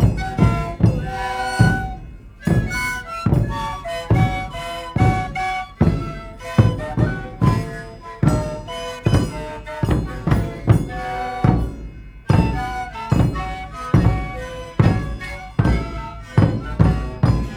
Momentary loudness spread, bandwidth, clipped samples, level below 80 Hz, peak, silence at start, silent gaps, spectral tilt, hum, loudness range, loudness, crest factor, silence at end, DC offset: 12 LU; 16 kHz; under 0.1%; -28 dBFS; 0 dBFS; 0 s; none; -7 dB/octave; none; 1 LU; -21 LUFS; 18 dB; 0 s; under 0.1%